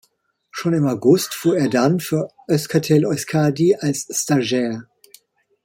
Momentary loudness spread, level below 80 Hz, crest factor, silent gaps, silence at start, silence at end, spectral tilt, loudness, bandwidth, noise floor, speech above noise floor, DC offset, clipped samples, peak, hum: 7 LU; -60 dBFS; 16 dB; none; 0.55 s; 0.8 s; -5.5 dB/octave; -19 LUFS; 16.5 kHz; -65 dBFS; 47 dB; under 0.1%; under 0.1%; -2 dBFS; none